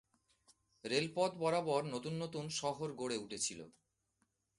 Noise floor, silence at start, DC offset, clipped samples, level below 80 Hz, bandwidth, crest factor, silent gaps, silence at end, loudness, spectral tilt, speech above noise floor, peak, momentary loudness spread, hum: -82 dBFS; 0.85 s; under 0.1%; under 0.1%; -76 dBFS; 11.5 kHz; 22 dB; none; 0.9 s; -38 LUFS; -4 dB/octave; 44 dB; -18 dBFS; 7 LU; none